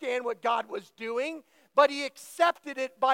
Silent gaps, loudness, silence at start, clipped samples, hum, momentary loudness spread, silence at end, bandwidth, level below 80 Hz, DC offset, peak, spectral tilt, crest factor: none; -29 LUFS; 0 s; under 0.1%; none; 13 LU; 0 s; 16.5 kHz; under -90 dBFS; under 0.1%; -8 dBFS; -2 dB/octave; 22 dB